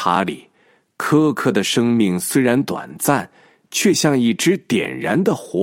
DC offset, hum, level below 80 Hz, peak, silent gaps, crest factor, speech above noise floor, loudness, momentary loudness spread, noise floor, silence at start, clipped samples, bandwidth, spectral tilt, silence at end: under 0.1%; none; -64 dBFS; 0 dBFS; none; 18 dB; 40 dB; -18 LUFS; 9 LU; -58 dBFS; 0 s; under 0.1%; 16.5 kHz; -4.5 dB/octave; 0 s